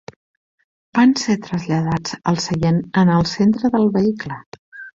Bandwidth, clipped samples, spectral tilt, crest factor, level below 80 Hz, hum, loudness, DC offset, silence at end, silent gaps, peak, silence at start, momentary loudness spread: 7.8 kHz; under 0.1%; -6 dB/octave; 16 dB; -48 dBFS; none; -18 LUFS; under 0.1%; 0.05 s; 4.46-4.52 s, 4.59-4.72 s; -2 dBFS; 0.95 s; 9 LU